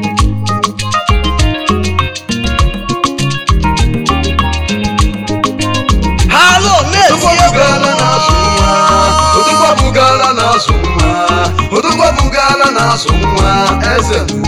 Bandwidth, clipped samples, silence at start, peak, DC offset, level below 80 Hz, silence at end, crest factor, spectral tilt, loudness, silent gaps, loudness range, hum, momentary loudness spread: 16.5 kHz; 0.4%; 0 s; 0 dBFS; 2%; -18 dBFS; 0 s; 10 dB; -4 dB/octave; -10 LUFS; none; 5 LU; none; 7 LU